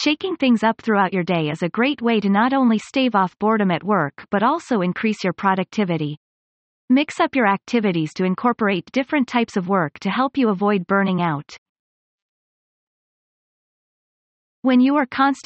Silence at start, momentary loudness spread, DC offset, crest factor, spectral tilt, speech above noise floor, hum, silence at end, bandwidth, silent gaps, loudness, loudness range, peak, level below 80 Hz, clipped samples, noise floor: 0 s; 5 LU; under 0.1%; 16 dB; -6.5 dB/octave; over 71 dB; none; 0.05 s; 8.4 kHz; 6.17-6.88 s, 11.58-14.63 s; -20 LUFS; 5 LU; -4 dBFS; -64 dBFS; under 0.1%; under -90 dBFS